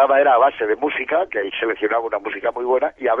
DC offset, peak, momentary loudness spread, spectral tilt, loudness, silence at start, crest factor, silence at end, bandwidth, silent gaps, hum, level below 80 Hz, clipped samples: under 0.1%; -4 dBFS; 9 LU; -6 dB/octave; -19 LUFS; 0 s; 16 dB; 0 s; 3.7 kHz; none; none; -60 dBFS; under 0.1%